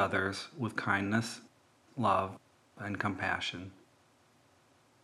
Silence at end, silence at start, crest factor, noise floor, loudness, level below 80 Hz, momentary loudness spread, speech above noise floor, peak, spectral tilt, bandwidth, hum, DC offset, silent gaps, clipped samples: 1.3 s; 0 s; 20 dB; -67 dBFS; -34 LUFS; -78 dBFS; 17 LU; 33 dB; -16 dBFS; -5 dB/octave; 13.5 kHz; none; under 0.1%; none; under 0.1%